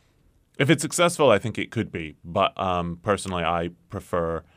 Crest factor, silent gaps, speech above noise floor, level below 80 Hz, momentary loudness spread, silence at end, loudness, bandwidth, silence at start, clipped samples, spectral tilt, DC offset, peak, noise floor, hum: 20 dB; none; 38 dB; -50 dBFS; 10 LU; 0.15 s; -24 LUFS; 15.5 kHz; 0.6 s; under 0.1%; -4.5 dB/octave; under 0.1%; -4 dBFS; -62 dBFS; none